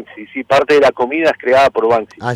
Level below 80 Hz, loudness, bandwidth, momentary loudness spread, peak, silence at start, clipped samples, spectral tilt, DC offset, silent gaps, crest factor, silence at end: -50 dBFS; -13 LUFS; 13 kHz; 7 LU; -2 dBFS; 0 s; under 0.1%; -5 dB/octave; under 0.1%; none; 10 dB; 0 s